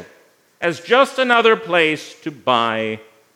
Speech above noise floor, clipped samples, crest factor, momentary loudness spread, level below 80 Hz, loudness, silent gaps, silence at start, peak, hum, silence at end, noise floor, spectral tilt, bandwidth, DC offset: 36 dB; under 0.1%; 18 dB; 12 LU; -72 dBFS; -17 LUFS; none; 0 s; 0 dBFS; none; 0.35 s; -53 dBFS; -4 dB/octave; 14 kHz; under 0.1%